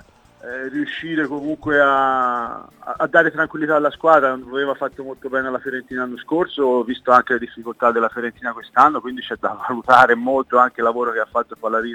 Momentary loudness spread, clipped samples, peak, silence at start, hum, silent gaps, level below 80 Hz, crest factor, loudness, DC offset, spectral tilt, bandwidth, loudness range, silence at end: 12 LU; under 0.1%; 0 dBFS; 0.45 s; none; none; -58 dBFS; 18 dB; -18 LUFS; under 0.1%; -5.5 dB/octave; 18 kHz; 3 LU; 0 s